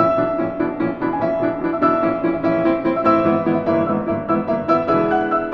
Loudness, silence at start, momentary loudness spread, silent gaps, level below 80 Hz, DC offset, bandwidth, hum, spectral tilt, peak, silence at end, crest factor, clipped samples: -19 LUFS; 0 s; 5 LU; none; -46 dBFS; under 0.1%; 5.8 kHz; none; -9.5 dB/octave; -2 dBFS; 0 s; 16 dB; under 0.1%